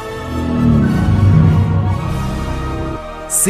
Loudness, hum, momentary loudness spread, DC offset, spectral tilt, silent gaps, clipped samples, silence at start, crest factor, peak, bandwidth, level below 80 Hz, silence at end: -15 LUFS; none; 12 LU; under 0.1%; -6 dB/octave; none; under 0.1%; 0 s; 12 dB; -2 dBFS; 15.5 kHz; -26 dBFS; 0 s